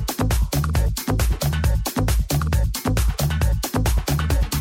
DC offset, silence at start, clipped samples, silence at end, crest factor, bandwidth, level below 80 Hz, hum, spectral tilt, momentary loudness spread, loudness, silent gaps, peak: under 0.1%; 0 s; under 0.1%; 0 s; 14 dB; 17 kHz; -22 dBFS; none; -5 dB/octave; 1 LU; -22 LUFS; none; -6 dBFS